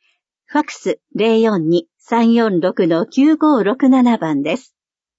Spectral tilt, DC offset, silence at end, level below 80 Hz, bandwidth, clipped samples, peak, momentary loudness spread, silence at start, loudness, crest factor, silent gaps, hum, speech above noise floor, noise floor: -6.5 dB/octave; under 0.1%; 0.6 s; -70 dBFS; 8 kHz; under 0.1%; -2 dBFS; 9 LU; 0.5 s; -16 LUFS; 12 dB; none; none; 46 dB; -60 dBFS